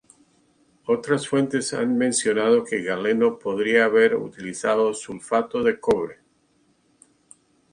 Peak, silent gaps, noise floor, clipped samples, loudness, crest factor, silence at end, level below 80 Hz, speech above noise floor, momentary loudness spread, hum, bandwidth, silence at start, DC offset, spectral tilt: -6 dBFS; none; -64 dBFS; under 0.1%; -22 LUFS; 18 dB; 1.6 s; -62 dBFS; 42 dB; 8 LU; none; 11 kHz; 0.9 s; under 0.1%; -4 dB/octave